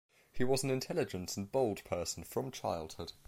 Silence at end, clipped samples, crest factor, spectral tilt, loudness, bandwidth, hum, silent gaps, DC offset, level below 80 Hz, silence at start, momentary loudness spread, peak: 0 s; under 0.1%; 18 dB; -4.5 dB/octave; -37 LUFS; 16.5 kHz; none; none; under 0.1%; -60 dBFS; 0.1 s; 7 LU; -18 dBFS